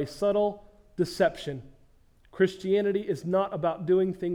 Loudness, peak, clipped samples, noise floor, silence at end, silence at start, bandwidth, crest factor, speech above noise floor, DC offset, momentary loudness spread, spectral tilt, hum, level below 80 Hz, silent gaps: -27 LUFS; -10 dBFS; under 0.1%; -59 dBFS; 0 s; 0 s; 13.5 kHz; 18 dB; 32 dB; under 0.1%; 12 LU; -6.5 dB/octave; none; -58 dBFS; none